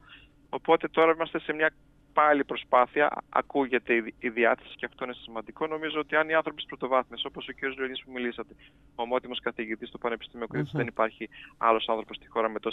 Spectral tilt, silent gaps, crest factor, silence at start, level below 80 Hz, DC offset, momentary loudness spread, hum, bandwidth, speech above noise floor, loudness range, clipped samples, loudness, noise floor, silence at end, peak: -7 dB/octave; none; 22 dB; 0.1 s; -62 dBFS; under 0.1%; 12 LU; none; 4.3 kHz; 26 dB; 8 LU; under 0.1%; -28 LUFS; -54 dBFS; 0 s; -8 dBFS